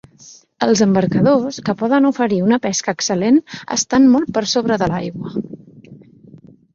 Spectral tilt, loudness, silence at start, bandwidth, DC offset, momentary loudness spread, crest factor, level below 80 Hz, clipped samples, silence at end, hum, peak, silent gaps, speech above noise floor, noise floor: -5 dB/octave; -16 LUFS; 0.25 s; 7.6 kHz; under 0.1%; 11 LU; 16 dB; -52 dBFS; under 0.1%; 0.8 s; none; -2 dBFS; none; 29 dB; -45 dBFS